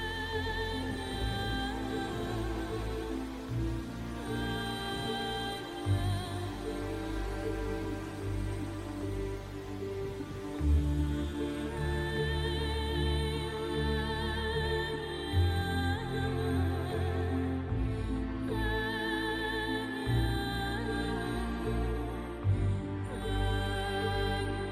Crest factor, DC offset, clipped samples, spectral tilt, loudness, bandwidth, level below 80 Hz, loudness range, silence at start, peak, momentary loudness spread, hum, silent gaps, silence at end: 14 dB; under 0.1%; under 0.1%; -6 dB/octave; -34 LUFS; 15 kHz; -40 dBFS; 4 LU; 0 s; -18 dBFS; 6 LU; none; none; 0 s